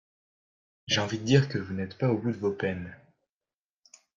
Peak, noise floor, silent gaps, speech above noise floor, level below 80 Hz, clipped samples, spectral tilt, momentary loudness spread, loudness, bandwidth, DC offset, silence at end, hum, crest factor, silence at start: -8 dBFS; under -90 dBFS; none; over 62 dB; -64 dBFS; under 0.1%; -5.5 dB/octave; 13 LU; -28 LUFS; 7.6 kHz; under 0.1%; 1.2 s; none; 22 dB; 0.9 s